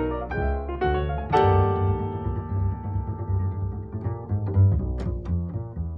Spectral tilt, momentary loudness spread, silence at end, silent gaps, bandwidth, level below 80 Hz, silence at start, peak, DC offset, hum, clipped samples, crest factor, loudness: -9.5 dB/octave; 10 LU; 0 s; none; 4.8 kHz; -34 dBFS; 0 s; -8 dBFS; 0.1%; none; under 0.1%; 18 dB; -26 LUFS